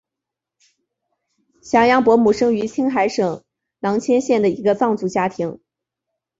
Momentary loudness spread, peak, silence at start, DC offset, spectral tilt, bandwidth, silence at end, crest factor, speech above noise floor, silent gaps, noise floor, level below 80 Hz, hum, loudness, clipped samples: 10 LU; -2 dBFS; 1.65 s; under 0.1%; -5.5 dB/octave; 7.8 kHz; 0.85 s; 16 dB; 68 dB; none; -85 dBFS; -56 dBFS; none; -18 LUFS; under 0.1%